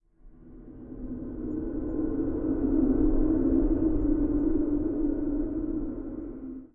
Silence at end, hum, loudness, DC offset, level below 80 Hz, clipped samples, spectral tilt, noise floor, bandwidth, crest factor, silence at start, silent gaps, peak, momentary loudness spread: 0.1 s; none; -28 LUFS; under 0.1%; -34 dBFS; under 0.1%; -13.5 dB/octave; -51 dBFS; 2.1 kHz; 14 dB; 0.25 s; none; -14 dBFS; 14 LU